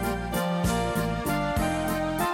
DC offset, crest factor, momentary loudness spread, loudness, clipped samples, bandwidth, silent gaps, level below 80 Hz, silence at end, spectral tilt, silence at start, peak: under 0.1%; 14 dB; 2 LU; -27 LUFS; under 0.1%; 17 kHz; none; -38 dBFS; 0 s; -5.5 dB/octave; 0 s; -14 dBFS